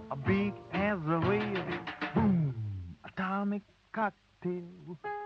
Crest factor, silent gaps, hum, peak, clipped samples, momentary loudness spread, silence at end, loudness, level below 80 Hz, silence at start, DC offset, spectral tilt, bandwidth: 18 dB; none; none; -14 dBFS; under 0.1%; 12 LU; 0 s; -33 LUFS; -58 dBFS; 0 s; under 0.1%; -9 dB/octave; 6.2 kHz